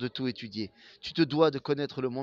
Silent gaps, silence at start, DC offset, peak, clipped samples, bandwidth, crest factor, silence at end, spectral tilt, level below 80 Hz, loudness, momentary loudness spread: none; 0 s; under 0.1%; -8 dBFS; under 0.1%; 7.4 kHz; 22 dB; 0 s; -7 dB/octave; -68 dBFS; -30 LUFS; 14 LU